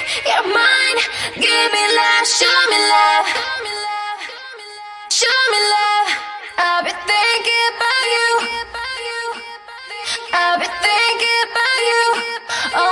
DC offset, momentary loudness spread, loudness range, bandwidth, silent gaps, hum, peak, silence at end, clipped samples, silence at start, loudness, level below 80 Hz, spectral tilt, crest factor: under 0.1%; 14 LU; 5 LU; 11.5 kHz; none; none; -2 dBFS; 0 s; under 0.1%; 0 s; -15 LUFS; -58 dBFS; 1 dB/octave; 16 dB